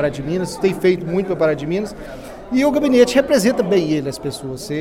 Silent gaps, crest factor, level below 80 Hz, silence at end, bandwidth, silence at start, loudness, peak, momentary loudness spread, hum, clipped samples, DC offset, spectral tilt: none; 18 dB; -44 dBFS; 0 s; 17 kHz; 0 s; -18 LUFS; 0 dBFS; 14 LU; none; under 0.1%; under 0.1%; -5.5 dB/octave